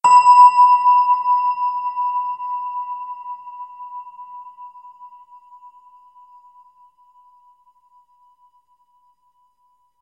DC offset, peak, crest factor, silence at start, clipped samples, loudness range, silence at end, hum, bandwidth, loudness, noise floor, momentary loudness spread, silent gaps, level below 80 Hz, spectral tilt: under 0.1%; -2 dBFS; 18 dB; 0.05 s; under 0.1%; 26 LU; 4.95 s; none; 8.4 kHz; -15 LUFS; -63 dBFS; 28 LU; none; -76 dBFS; 0 dB/octave